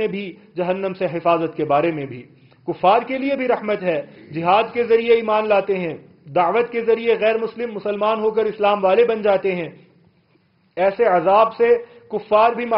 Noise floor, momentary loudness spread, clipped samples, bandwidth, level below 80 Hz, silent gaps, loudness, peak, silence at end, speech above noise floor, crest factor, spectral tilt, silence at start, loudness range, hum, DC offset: -60 dBFS; 14 LU; under 0.1%; 5.6 kHz; -60 dBFS; none; -19 LUFS; -2 dBFS; 0 s; 41 dB; 16 dB; -4 dB/octave; 0 s; 2 LU; none; under 0.1%